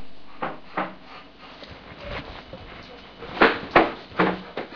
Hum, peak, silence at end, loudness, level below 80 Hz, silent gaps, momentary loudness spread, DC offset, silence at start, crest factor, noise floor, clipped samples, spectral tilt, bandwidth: none; -2 dBFS; 0 s; -24 LUFS; -48 dBFS; none; 23 LU; under 0.1%; 0 s; 26 dB; -45 dBFS; under 0.1%; -6.5 dB/octave; 5.4 kHz